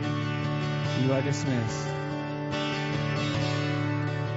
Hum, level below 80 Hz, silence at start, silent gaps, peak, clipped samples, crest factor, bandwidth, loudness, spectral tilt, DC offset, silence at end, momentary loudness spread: none; -56 dBFS; 0 s; none; -14 dBFS; under 0.1%; 14 dB; 8 kHz; -29 LUFS; -5.5 dB/octave; under 0.1%; 0 s; 5 LU